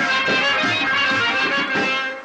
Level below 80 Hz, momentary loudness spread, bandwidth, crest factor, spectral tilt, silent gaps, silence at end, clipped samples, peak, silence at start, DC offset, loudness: -58 dBFS; 2 LU; 9.4 kHz; 10 dB; -3 dB/octave; none; 0 s; under 0.1%; -10 dBFS; 0 s; under 0.1%; -17 LUFS